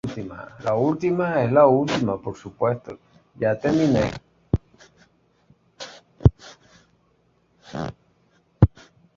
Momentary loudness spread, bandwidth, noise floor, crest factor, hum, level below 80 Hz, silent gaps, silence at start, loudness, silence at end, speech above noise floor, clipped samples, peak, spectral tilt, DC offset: 22 LU; 7.6 kHz; -64 dBFS; 22 dB; none; -38 dBFS; none; 0.05 s; -22 LUFS; 0.5 s; 42 dB; under 0.1%; -2 dBFS; -7.5 dB/octave; under 0.1%